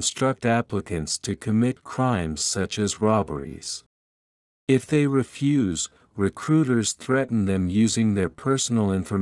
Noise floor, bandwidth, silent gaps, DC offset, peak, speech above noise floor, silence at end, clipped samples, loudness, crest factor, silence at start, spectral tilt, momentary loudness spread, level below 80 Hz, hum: under -90 dBFS; 12 kHz; 3.86-4.67 s; under 0.1%; -6 dBFS; over 67 dB; 0 s; under 0.1%; -24 LUFS; 18 dB; 0 s; -5 dB/octave; 8 LU; -54 dBFS; none